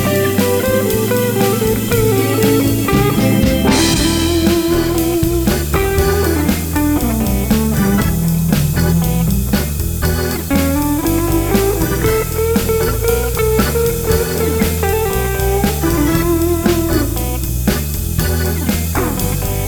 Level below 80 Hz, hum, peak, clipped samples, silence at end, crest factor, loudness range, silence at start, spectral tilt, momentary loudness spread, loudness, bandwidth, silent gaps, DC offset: -22 dBFS; none; -2 dBFS; under 0.1%; 0 s; 12 dB; 2 LU; 0 s; -5.5 dB/octave; 4 LU; -15 LUFS; over 20 kHz; none; under 0.1%